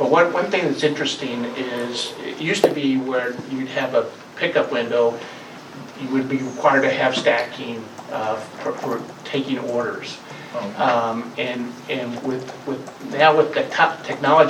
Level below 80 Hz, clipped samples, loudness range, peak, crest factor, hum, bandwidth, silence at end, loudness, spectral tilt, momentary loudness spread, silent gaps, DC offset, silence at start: -70 dBFS; under 0.1%; 4 LU; 0 dBFS; 22 dB; none; 16.5 kHz; 0 s; -21 LUFS; -4.5 dB/octave; 14 LU; none; under 0.1%; 0 s